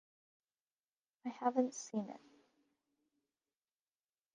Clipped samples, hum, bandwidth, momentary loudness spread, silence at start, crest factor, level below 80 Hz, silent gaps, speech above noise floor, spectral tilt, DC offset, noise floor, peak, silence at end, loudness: under 0.1%; none; 9.4 kHz; 14 LU; 1.25 s; 24 dB; under -90 dBFS; none; over 51 dB; -5 dB/octave; under 0.1%; under -90 dBFS; -22 dBFS; 2.15 s; -40 LUFS